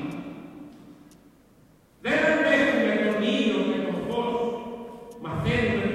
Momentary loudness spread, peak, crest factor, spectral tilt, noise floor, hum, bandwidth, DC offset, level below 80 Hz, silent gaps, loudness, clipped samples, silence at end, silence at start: 20 LU; -8 dBFS; 18 dB; -6 dB/octave; -57 dBFS; none; 13.5 kHz; under 0.1%; -52 dBFS; none; -24 LUFS; under 0.1%; 0 s; 0 s